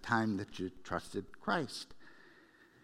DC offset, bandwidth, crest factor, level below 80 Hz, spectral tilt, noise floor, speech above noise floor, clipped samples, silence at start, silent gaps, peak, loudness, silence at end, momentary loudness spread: under 0.1%; 15 kHz; 24 dB; -66 dBFS; -5 dB/octave; -63 dBFS; 26 dB; under 0.1%; 0 s; none; -16 dBFS; -38 LUFS; 0.2 s; 18 LU